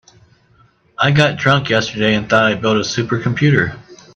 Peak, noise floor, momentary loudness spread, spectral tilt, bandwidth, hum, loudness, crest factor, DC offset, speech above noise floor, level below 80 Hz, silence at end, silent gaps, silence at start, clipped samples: 0 dBFS; -53 dBFS; 6 LU; -5.5 dB/octave; 8.2 kHz; none; -15 LUFS; 16 dB; under 0.1%; 38 dB; -48 dBFS; 0.2 s; none; 1 s; under 0.1%